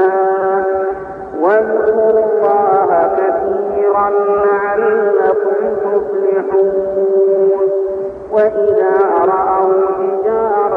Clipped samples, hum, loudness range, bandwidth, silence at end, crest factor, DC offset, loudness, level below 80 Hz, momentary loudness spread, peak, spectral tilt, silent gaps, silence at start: under 0.1%; none; 1 LU; 3 kHz; 0 s; 12 dB; under 0.1%; -13 LUFS; -50 dBFS; 5 LU; -2 dBFS; -9 dB/octave; none; 0 s